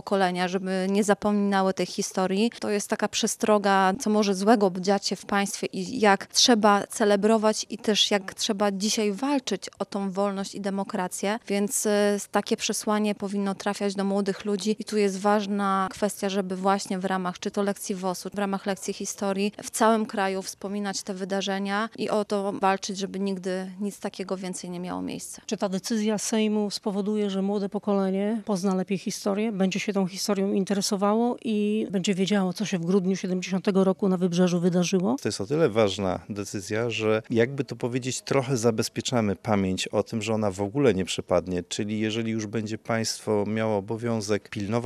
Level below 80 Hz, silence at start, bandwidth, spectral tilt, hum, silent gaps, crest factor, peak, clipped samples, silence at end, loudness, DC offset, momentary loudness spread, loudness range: -68 dBFS; 0.05 s; 14.5 kHz; -4.5 dB/octave; none; none; 20 dB; -6 dBFS; under 0.1%; 0 s; -26 LUFS; under 0.1%; 8 LU; 6 LU